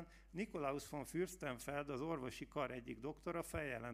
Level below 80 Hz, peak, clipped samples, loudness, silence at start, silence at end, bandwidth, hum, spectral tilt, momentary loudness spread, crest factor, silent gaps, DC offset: -64 dBFS; -28 dBFS; under 0.1%; -46 LUFS; 0 s; 0 s; 15.5 kHz; none; -5.5 dB/octave; 4 LU; 18 dB; none; under 0.1%